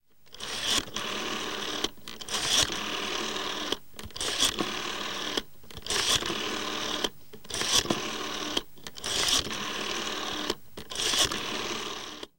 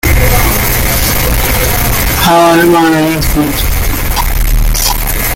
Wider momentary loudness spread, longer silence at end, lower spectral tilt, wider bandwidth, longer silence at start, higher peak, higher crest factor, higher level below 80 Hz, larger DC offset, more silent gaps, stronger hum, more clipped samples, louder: first, 11 LU vs 7 LU; about the same, 0 s vs 0 s; second, -1 dB/octave vs -4 dB/octave; about the same, 17 kHz vs 17.5 kHz; about the same, 0 s vs 0.05 s; second, -6 dBFS vs 0 dBFS; first, 24 dB vs 8 dB; second, -54 dBFS vs -14 dBFS; first, 0.6% vs under 0.1%; neither; neither; neither; second, -29 LUFS vs -10 LUFS